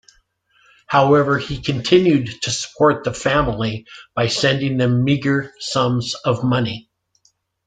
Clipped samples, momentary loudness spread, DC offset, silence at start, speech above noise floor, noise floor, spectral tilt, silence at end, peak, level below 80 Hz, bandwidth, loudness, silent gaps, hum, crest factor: under 0.1%; 9 LU; under 0.1%; 0.9 s; 44 dB; -62 dBFS; -5.5 dB/octave; 0.85 s; -2 dBFS; -44 dBFS; 9.4 kHz; -18 LUFS; none; none; 18 dB